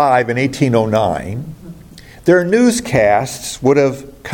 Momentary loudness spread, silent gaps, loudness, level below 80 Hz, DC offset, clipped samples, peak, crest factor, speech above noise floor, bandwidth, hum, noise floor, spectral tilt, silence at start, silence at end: 14 LU; none; -14 LUFS; -44 dBFS; under 0.1%; under 0.1%; 0 dBFS; 14 dB; 24 dB; 17.5 kHz; none; -38 dBFS; -5.5 dB/octave; 0 s; 0 s